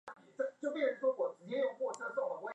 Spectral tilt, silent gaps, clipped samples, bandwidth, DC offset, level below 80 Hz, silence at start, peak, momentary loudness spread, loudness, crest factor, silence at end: -4.5 dB/octave; none; under 0.1%; 9.8 kHz; under 0.1%; under -90 dBFS; 0.05 s; -22 dBFS; 7 LU; -37 LUFS; 16 dB; 0 s